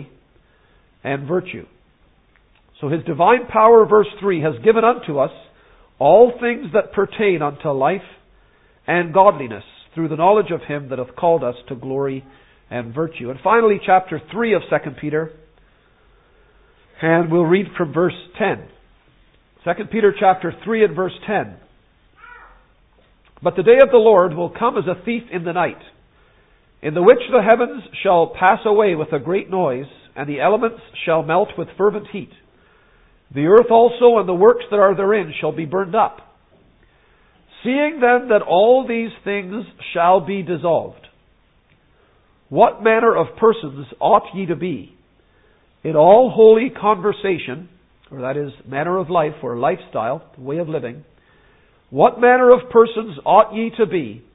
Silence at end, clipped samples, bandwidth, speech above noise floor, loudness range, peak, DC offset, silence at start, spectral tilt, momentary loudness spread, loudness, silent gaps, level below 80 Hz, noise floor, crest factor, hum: 0.15 s; under 0.1%; 4 kHz; 41 dB; 6 LU; 0 dBFS; under 0.1%; 0 s; -10 dB/octave; 16 LU; -16 LUFS; none; -56 dBFS; -57 dBFS; 18 dB; none